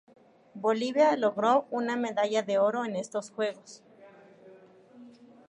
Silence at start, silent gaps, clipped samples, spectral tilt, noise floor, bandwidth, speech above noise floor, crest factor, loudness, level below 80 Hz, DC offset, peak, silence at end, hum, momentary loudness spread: 0.55 s; none; under 0.1%; -4.5 dB/octave; -54 dBFS; 10.5 kHz; 27 dB; 18 dB; -28 LUFS; -84 dBFS; under 0.1%; -12 dBFS; 0.4 s; none; 9 LU